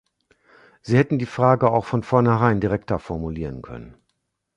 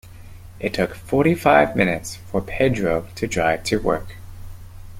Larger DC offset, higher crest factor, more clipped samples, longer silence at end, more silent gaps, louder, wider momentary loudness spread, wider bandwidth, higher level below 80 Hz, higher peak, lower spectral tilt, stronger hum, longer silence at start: neither; about the same, 20 dB vs 20 dB; neither; first, 0.65 s vs 0 s; neither; about the same, -21 LUFS vs -21 LUFS; first, 18 LU vs 13 LU; second, 8.8 kHz vs 16.5 kHz; about the same, -44 dBFS vs -40 dBFS; about the same, -2 dBFS vs -2 dBFS; first, -8.5 dB/octave vs -5.5 dB/octave; neither; first, 0.85 s vs 0.05 s